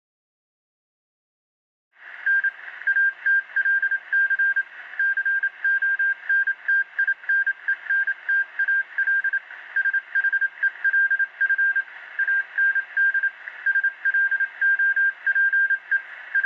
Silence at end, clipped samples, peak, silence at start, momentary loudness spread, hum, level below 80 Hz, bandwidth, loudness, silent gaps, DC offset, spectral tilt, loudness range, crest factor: 0 s; under 0.1%; -14 dBFS; 2 s; 6 LU; none; -88 dBFS; 5 kHz; -21 LUFS; none; under 0.1%; -0.5 dB/octave; 2 LU; 10 dB